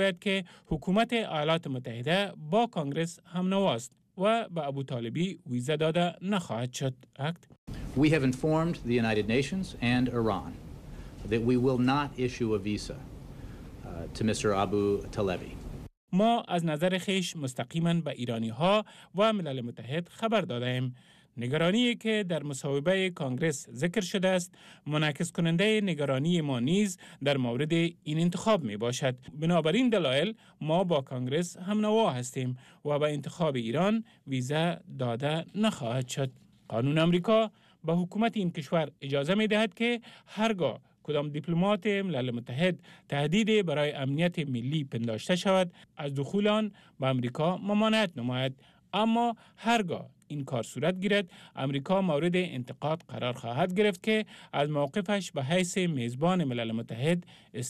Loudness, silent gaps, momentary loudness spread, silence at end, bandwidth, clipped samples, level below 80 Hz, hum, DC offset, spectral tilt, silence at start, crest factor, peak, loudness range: -30 LUFS; 7.58-7.67 s, 15.97-16.08 s; 10 LU; 0 s; 13.5 kHz; under 0.1%; -56 dBFS; none; under 0.1%; -6 dB/octave; 0 s; 14 dB; -16 dBFS; 2 LU